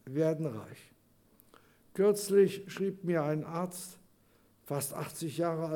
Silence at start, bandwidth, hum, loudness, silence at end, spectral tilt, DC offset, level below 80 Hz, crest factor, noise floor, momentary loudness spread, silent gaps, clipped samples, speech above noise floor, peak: 0.05 s; 18.5 kHz; none; -32 LUFS; 0 s; -6 dB/octave; under 0.1%; -76 dBFS; 18 dB; -66 dBFS; 17 LU; none; under 0.1%; 35 dB; -14 dBFS